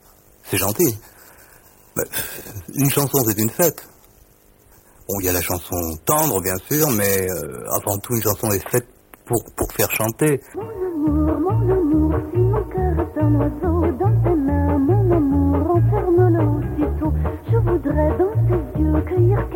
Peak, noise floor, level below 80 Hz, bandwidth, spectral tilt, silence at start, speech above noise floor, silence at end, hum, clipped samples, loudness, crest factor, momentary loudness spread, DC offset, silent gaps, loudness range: -2 dBFS; -52 dBFS; -30 dBFS; 17 kHz; -6 dB/octave; 0.45 s; 33 dB; 0 s; none; under 0.1%; -19 LUFS; 16 dB; 7 LU; under 0.1%; none; 4 LU